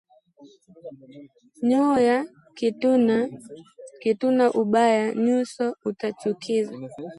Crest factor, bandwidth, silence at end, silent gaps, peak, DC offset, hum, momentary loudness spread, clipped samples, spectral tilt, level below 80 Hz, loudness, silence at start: 16 dB; 11.5 kHz; 0.05 s; none; -8 dBFS; under 0.1%; none; 20 LU; under 0.1%; -6 dB/octave; -72 dBFS; -23 LUFS; 0.4 s